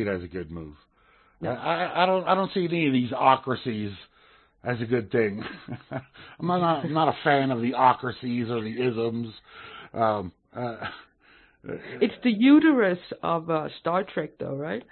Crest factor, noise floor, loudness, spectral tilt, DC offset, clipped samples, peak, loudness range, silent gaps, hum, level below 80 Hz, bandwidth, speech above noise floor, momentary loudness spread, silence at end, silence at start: 22 dB; -60 dBFS; -25 LUFS; -10.5 dB/octave; under 0.1%; under 0.1%; -4 dBFS; 6 LU; none; none; -62 dBFS; 4.4 kHz; 35 dB; 17 LU; 0.1 s; 0 s